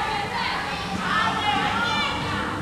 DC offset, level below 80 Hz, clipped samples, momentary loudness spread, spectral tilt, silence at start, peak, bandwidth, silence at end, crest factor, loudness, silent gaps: under 0.1%; -46 dBFS; under 0.1%; 5 LU; -4 dB/octave; 0 s; -10 dBFS; 15.5 kHz; 0 s; 14 dB; -24 LUFS; none